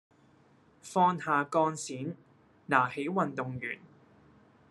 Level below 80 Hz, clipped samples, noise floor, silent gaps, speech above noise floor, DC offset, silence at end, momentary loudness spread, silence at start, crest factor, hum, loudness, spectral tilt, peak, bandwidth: -76 dBFS; under 0.1%; -63 dBFS; none; 33 dB; under 0.1%; 0.95 s; 14 LU; 0.85 s; 24 dB; none; -30 LUFS; -5.5 dB/octave; -8 dBFS; 12 kHz